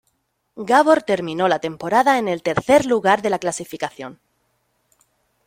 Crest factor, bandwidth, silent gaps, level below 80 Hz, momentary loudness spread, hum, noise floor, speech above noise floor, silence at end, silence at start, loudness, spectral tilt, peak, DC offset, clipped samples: 20 dB; 16 kHz; none; -58 dBFS; 14 LU; none; -69 dBFS; 51 dB; 1.35 s; 0.55 s; -18 LUFS; -4.5 dB/octave; -2 dBFS; under 0.1%; under 0.1%